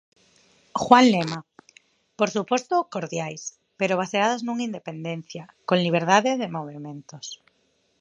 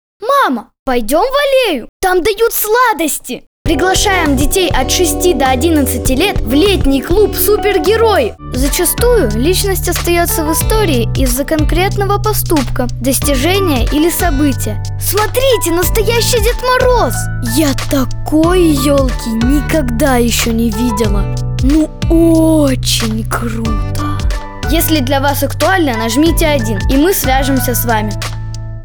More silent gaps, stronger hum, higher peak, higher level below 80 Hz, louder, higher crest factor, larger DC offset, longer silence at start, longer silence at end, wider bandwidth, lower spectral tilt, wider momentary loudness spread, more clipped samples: second, none vs 0.79-0.86 s, 1.89-2.00 s, 3.47-3.65 s; neither; about the same, 0 dBFS vs 0 dBFS; second, -68 dBFS vs -20 dBFS; second, -23 LUFS vs -12 LUFS; first, 24 dB vs 12 dB; neither; first, 0.75 s vs 0.2 s; first, 0.65 s vs 0 s; second, 9 kHz vs over 20 kHz; about the same, -4.5 dB/octave vs -4.5 dB/octave; first, 20 LU vs 7 LU; neither